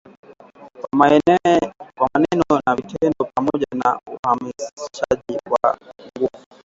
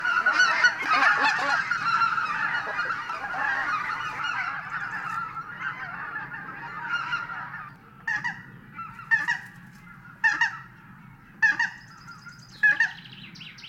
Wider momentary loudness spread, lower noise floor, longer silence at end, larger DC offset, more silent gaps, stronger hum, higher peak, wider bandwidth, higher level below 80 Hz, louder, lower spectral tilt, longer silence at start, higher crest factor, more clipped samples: second, 15 LU vs 21 LU; second, -44 dBFS vs -49 dBFS; first, 0.25 s vs 0 s; neither; first, 4.19-4.23 s, 4.73-4.77 s vs none; neither; first, 0 dBFS vs -8 dBFS; second, 7.8 kHz vs 16 kHz; first, -54 dBFS vs -64 dBFS; first, -19 LUFS vs -25 LUFS; first, -6 dB/octave vs -2 dB/octave; first, 0.6 s vs 0 s; about the same, 20 dB vs 20 dB; neither